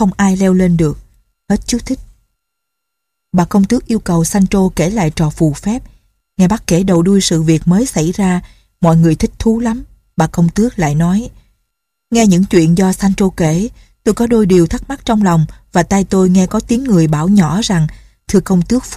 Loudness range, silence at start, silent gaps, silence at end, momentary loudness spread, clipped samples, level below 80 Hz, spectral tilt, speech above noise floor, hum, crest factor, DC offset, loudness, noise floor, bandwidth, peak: 4 LU; 0 s; none; 0 s; 8 LU; under 0.1%; -32 dBFS; -6.5 dB/octave; 64 dB; none; 12 dB; under 0.1%; -13 LUFS; -75 dBFS; 14.5 kHz; 0 dBFS